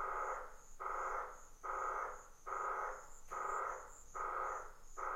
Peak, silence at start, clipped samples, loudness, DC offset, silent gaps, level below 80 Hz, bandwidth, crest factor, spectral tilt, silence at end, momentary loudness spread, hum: -30 dBFS; 0 s; under 0.1%; -44 LUFS; under 0.1%; none; -60 dBFS; 16 kHz; 14 dB; -3 dB/octave; 0 s; 10 LU; none